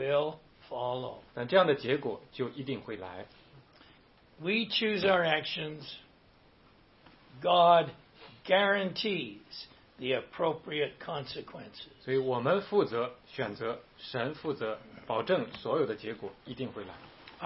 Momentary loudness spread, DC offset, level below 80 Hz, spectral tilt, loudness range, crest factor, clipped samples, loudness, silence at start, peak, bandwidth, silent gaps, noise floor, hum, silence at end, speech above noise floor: 19 LU; under 0.1%; -68 dBFS; -8.5 dB/octave; 6 LU; 22 dB; under 0.1%; -31 LUFS; 0 s; -10 dBFS; 5.8 kHz; none; -62 dBFS; none; 0 s; 30 dB